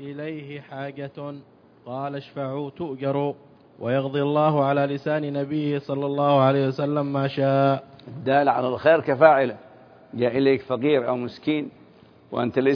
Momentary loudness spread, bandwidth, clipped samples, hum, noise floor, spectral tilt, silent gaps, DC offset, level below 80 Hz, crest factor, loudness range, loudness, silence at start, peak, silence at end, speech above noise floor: 16 LU; 5.4 kHz; under 0.1%; none; -52 dBFS; -9 dB/octave; none; under 0.1%; -68 dBFS; 22 dB; 9 LU; -23 LUFS; 0 s; -2 dBFS; 0 s; 29 dB